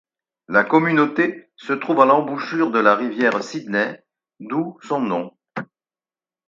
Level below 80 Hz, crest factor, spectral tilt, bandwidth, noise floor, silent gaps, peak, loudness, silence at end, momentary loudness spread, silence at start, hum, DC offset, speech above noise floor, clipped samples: -72 dBFS; 20 dB; -6.5 dB/octave; 7.6 kHz; under -90 dBFS; none; 0 dBFS; -19 LUFS; 0.85 s; 11 LU; 0.5 s; none; under 0.1%; over 71 dB; under 0.1%